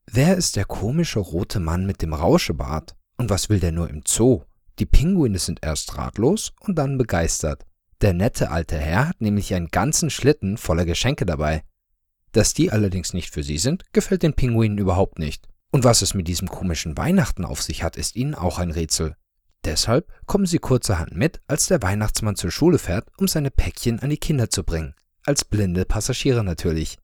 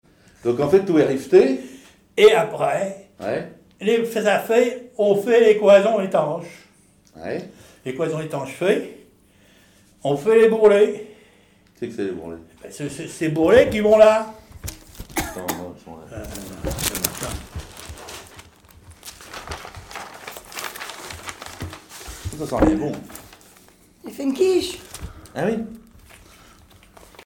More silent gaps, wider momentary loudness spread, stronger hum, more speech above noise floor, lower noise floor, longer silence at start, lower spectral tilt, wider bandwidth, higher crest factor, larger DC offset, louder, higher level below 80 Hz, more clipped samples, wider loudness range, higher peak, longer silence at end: neither; second, 8 LU vs 23 LU; neither; first, 52 dB vs 37 dB; first, -72 dBFS vs -55 dBFS; second, 0.1 s vs 0.45 s; about the same, -5 dB/octave vs -5 dB/octave; about the same, 19 kHz vs 19 kHz; about the same, 22 dB vs 20 dB; neither; second, -22 LUFS vs -19 LUFS; first, -30 dBFS vs -44 dBFS; neither; second, 2 LU vs 15 LU; about the same, 0 dBFS vs 0 dBFS; second, 0.1 s vs 1.45 s